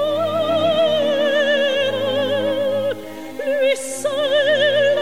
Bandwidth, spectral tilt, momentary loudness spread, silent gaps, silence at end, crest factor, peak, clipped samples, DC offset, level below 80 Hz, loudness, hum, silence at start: 16.5 kHz; -3.5 dB/octave; 7 LU; none; 0 s; 12 dB; -6 dBFS; under 0.1%; 0.9%; -66 dBFS; -18 LUFS; none; 0 s